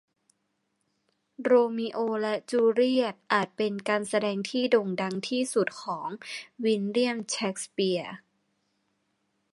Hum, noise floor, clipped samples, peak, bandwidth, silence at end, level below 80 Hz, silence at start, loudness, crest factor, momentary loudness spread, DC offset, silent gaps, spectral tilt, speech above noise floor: none; -77 dBFS; under 0.1%; -8 dBFS; 11.5 kHz; 1.35 s; -80 dBFS; 1.4 s; -27 LUFS; 20 dB; 11 LU; under 0.1%; none; -4.5 dB/octave; 50 dB